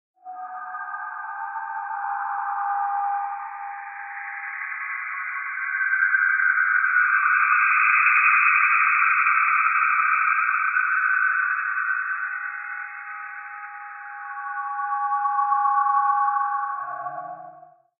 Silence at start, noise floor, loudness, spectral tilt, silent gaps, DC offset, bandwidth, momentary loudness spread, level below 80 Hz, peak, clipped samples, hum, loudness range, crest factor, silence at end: 0.25 s; -48 dBFS; -21 LUFS; 11.5 dB/octave; none; under 0.1%; 2.8 kHz; 17 LU; under -90 dBFS; -6 dBFS; under 0.1%; none; 11 LU; 18 dB; 0.4 s